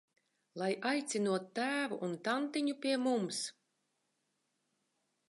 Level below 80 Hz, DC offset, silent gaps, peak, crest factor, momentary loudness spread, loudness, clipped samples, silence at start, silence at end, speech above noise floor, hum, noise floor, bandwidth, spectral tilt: under -90 dBFS; under 0.1%; none; -20 dBFS; 18 dB; 6 LU; -36 LUFS; under 0.1%; 0.55 s; 1.75 s; 47 dB; none; -82 dBFS; 11.5 kHz; -4 dB/octave